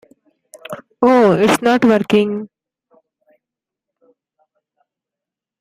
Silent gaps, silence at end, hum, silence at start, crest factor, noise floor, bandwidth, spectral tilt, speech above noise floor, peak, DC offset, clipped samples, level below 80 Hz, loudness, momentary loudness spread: none; 3.15 s; none; 0.55 s; 16 dB; -86 dBFS; 16 kHz; -5.5 dB/octave; 73 dB; -2 dBFS; under 0.1%; under 0.1%; -58 dBFS; -14 LUFS; 21 LU